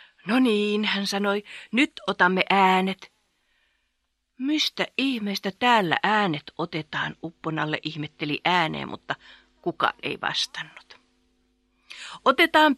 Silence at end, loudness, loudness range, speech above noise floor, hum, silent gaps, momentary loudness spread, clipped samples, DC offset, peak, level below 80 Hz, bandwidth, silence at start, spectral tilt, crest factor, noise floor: 0 s; -24 LUFS; 5 LU; 51 dB; none; none; 14 LU; under 0.1%; under 0.1%; -2 dBFS; -68 dBFS; 13.5 kHz; 0.25 s; -4.5 dB/octave; 24 dB; -76 dBFS